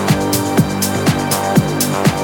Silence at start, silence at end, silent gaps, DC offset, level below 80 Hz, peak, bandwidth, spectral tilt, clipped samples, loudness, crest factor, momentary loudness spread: 0 s; 0 s; none; under 0.1%; -38 dBFS; 0 dBFS; 19 kHz; -5 dB/octave; under 0.1%; -15 LUFS; 14 dB; 2 LU